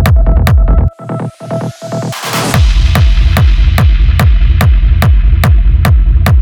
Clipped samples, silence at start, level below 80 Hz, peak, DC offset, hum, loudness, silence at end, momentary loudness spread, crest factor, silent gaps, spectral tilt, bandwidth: under 0.1%; 0 s; -8 dBFS; 0 dBFS; under 0.1%; none; -10 LUFS; 0 s; 10 LU; 6 dB; none; -6 dB/octave; 17.5 kHz